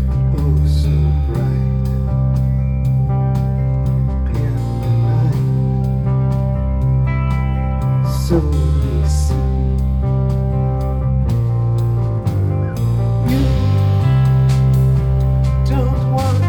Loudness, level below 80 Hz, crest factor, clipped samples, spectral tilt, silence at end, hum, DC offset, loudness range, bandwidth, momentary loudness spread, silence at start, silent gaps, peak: -17 LUFS; -20 dBFS; 12 dB; under 0.1%; -8.5 dB/octave; 0 s; none; under 0.1%; 2 LU; 11 kHz; 4 LU; 0 s; none; -2 dBFS